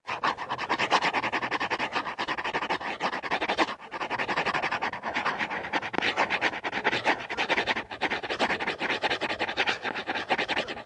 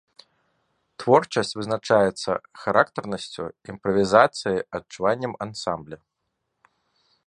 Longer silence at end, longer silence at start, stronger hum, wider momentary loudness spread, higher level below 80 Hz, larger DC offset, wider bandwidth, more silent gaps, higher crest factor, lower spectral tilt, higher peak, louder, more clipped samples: second, 0 s vs 1.3 s; second, 0.05 s vs 1 s; neither; second, 5 LU vs 15 LU; about the same, -62 dBFS vs -58 dBFS; neither; about the same, 11.5 kHz vs 11 kHz; neither; about the same, 22 dB vs 24 dB; second, -3 dB/octave vs -5 dB/octave; second, -8 dBFS vs 0 dBFS; second, -28 LUFS vs -23 LUFS; neither